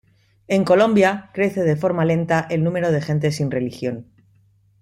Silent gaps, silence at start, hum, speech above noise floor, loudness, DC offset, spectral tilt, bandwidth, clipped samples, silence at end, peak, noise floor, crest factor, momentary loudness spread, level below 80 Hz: none; 0.5 s; none; 38 dB; -19 LUFS; under 0.1%; -7 dB/octave; 12.5 kHz; under 0.1%; 0.8 s; -2 dBFS; -57 dBFS; 18 dB; 9 LU; -56 dBFS